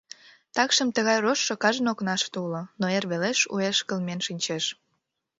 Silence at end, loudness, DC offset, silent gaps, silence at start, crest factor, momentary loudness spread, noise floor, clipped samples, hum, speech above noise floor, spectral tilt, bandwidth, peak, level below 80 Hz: 0.65 s; -25 LUFS; under 0.1%; none; 0.55 s; 22 dB; 8 LU; -77 dBFS; under 0.1%; none; 51 dB; -3 dB/octave; 8 kHz; -6 dBFS; -74 dBFS